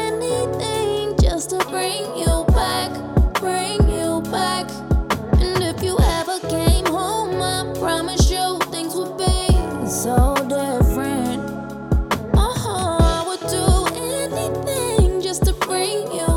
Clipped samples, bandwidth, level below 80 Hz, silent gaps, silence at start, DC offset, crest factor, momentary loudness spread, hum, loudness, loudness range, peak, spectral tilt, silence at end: under 0.1%; 17 kHz; -24 dBFS; none; 0 s; under 0.1%; 14 dB; 5 LU; none; -20 LUFS; 1 LU; -4 dBFS; -5 dB/octave; 0 s